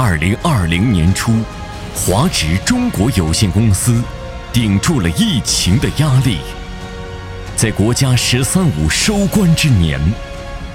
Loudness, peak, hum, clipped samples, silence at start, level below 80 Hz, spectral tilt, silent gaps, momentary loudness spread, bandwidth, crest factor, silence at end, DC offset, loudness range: -14 LUFS; 0 dBFS; none; under 0.1%; 0 s; -28 dBFS; -4.5 dB/octave; none; 15 LU; 17 kHz; 14 dB; 0 s; under 0.1%; 2 LU